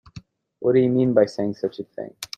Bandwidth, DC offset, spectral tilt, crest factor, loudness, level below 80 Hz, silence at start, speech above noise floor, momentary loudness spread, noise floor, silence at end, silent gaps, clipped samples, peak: 14.5 kHz; under 0.1%; -7 dB/octave; 20 dB; -21 LUFS; -60 dBFS; 0.15 s; 25 dB; 16 LU; -45 dBFS; 0.1 s; none; under 0.1%; -4 dBFS